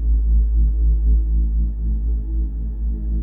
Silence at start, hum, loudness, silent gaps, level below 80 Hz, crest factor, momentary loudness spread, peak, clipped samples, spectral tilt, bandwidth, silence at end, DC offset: 0 s; none; -21 LUFS; none; -18 dBFS; 8 dB; 7 LU; -8 dBFS; under 0.1%; -14 dB/octave; 0.9 kHz; 0 s; under 0.1%